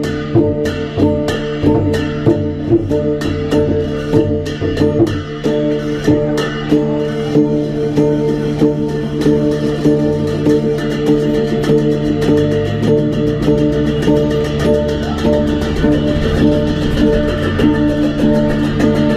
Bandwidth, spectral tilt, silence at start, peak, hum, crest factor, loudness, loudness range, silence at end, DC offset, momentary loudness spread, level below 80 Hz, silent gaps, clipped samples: 13.5 kHz; -7.5 dB/octave; 0 s; 0 dBFS; none; 14 dB; -15 LUFS; 2 LU; 0 s; under 0.1%; 4 LU; -30 dBFS; none; under 0.1%